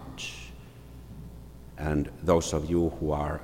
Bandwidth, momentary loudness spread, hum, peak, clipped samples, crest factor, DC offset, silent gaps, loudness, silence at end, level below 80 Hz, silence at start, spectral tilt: 16.5 kHz; 22 LU; none; -10 dBFS; under 0.1%; 20 dB; under 0.1%; none; -29 LUFS; 0 s; -44 dBFS; 0 s; -6 dB/octave